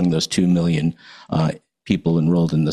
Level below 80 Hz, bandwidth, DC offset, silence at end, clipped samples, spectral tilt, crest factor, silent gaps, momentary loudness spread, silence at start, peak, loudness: -48 dBFS; 12 kHz; under 0.1%; 0 s; under 0.1%; -6.5 dB/octave; 14 dB; none; 7 LU; 0 s; -4 dBFS; -20 LUFS